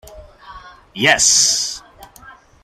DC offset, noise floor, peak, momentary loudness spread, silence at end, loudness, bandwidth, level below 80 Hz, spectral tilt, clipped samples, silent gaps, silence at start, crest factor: under 0.1%; -43 dBFS; 0 dBFS; 21 LU; 0.3 s; -13 LUFS; 16 kHz; -48 dBFS; 0 dB/octave; under 0.1%; none; 0.05 s; 20 dB